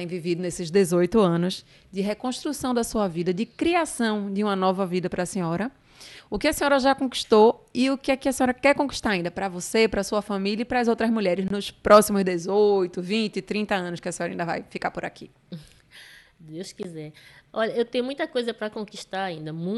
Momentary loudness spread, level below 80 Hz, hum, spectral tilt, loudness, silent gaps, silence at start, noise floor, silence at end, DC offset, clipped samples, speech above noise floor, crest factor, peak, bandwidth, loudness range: 15 LU; -52 dBFS; none; -5 dB/octave; -24 LUFS; none; 0 s; -49 dBFS; 0 s; under 0.1%; under 0.1%; 25 dB; 20 dB; -4 dBFS; 12.5 kHz; 10 LU